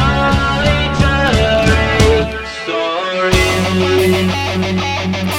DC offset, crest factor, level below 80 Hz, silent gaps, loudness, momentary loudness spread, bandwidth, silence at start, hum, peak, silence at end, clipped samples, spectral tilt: under 0.1%; 14 dB; -24 dBFS; none; -14 LUFS; 6 LU; 17.5 kHz; 0 s; none; 0 dBFS; 0 s; under 0.1%; -5 dB/octave